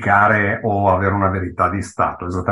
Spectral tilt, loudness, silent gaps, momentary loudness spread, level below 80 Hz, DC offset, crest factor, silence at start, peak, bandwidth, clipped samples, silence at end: -7.5 dB/octave; -17 LUFS; none; 8 LU; -36 dBFS; under 0.1%; 16 dB; 0 s; -2 dBFS; 11.5 kHz; under 0.1%; 0 s